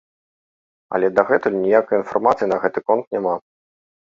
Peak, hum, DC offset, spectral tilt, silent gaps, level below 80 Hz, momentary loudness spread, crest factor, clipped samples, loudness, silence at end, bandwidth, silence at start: -2 dBFS; none; under 0.1%; -7.5 dB/octave; 3.07-3.11 s; -62 dBFS; 7 LU; 18 dB; under 0.1%; -19 LUFS; 0.75 s; 7.4 kHz; 0.9 s